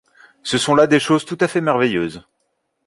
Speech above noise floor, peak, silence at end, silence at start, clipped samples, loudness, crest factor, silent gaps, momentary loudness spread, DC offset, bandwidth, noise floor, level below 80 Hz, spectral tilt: 54 dB; -2 dBFS; 0.65 s; 0.45 s; under 0.1%; -17 LUFS; 16 dB; none; 10 LU; under 0.1%; 11.5 kHz; -70 dBFS; -56 dBFS; -4.5 dB/octave